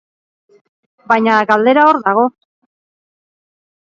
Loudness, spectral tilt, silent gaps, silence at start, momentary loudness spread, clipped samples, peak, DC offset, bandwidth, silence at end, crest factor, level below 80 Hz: -12 LUFS; -6 dB/octave; none; 1.1 s; 6 LU; under 0.1%; 0 dBFS; under 0.1%; 7.4 kHz; 1.6 s; 16 dB; -66 dBFS